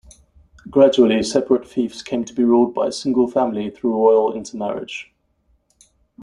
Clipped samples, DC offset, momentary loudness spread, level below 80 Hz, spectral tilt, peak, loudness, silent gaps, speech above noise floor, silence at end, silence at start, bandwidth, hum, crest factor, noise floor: under 0.1%; under 0.1%; 11 LU; -56 dBFS; -5.5 dB/octave; -2 dBFS; -18 LUFS; none; 45 dB; 0 s; 0.65 s; 11 kHz; none; 18 dB; -63 dBFS